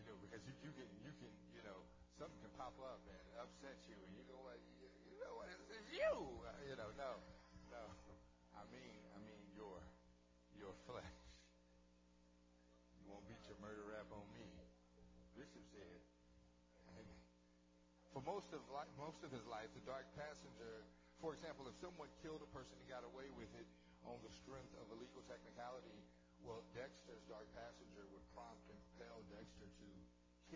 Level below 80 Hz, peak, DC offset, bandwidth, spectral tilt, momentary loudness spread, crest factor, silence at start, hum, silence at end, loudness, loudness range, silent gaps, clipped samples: -72 dBFS; -32 dBFS; under 0.1%; 8 kHz; -5 dB/octave; 12 LU; 24 dB; 0 s; 60 Hz at -70 dBFS; 0 s; -56 LUFS; 11 LU; none; under 0.1%